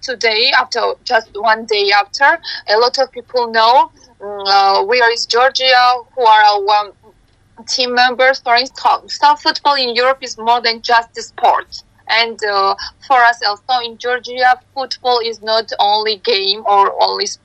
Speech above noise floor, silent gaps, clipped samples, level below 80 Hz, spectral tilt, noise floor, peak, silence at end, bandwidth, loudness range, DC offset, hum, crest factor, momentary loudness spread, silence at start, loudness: 36 dB; none; under 0.1%; -58 dBFS; -0.5 dB/octave; -50 dBFS; 0 dBFS; 0.1 s; 8.8 kHz; 3 LU; under 0.1%; none; 14 dB; 9 LU; 0.05 s; -13 LUFS